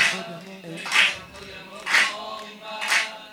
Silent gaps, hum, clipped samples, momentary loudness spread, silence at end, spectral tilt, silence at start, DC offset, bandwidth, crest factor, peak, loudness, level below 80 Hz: none; none; under 0.1%; 20 LU; 0 s; -0.5 dB/octave; 0 s; under 0.1%; 19 kHz; 22 dB; -4 dBFS; -21 LUFS; -64 dBFS